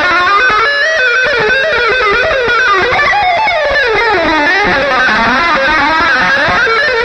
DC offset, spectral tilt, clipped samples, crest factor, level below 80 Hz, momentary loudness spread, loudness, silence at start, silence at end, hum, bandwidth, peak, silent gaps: 0.3%; -3.5 dB/octave; under 0.1%; 8 dB; -34 dBFS; 1 LU; -9 LUFS; 0 s; 0 s; none; 9.8 kHz; 0 dBFS; none